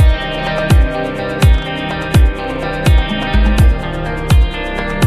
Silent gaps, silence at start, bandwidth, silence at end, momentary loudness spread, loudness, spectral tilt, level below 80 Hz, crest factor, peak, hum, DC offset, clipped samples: none; 0 s; 14.5 kHz; 0 s; 7 LU; -15 LUFS; -6 dB/octave; -14 dBFS; 12 dB; 0 dBFS; none; under 0.1%; under 0.1%